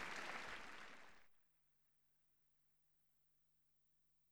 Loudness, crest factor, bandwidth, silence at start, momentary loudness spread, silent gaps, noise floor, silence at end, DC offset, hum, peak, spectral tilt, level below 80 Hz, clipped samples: -52 LUFS; 24 dB; over 20 kHz; 0 s; 15 LU; none; -81 dBFS; 0 s; under 0.1%; 50 Hz at -95 dBFS; -34 dBFS; -2 dB/octave; -82 dBFS; under 0.1%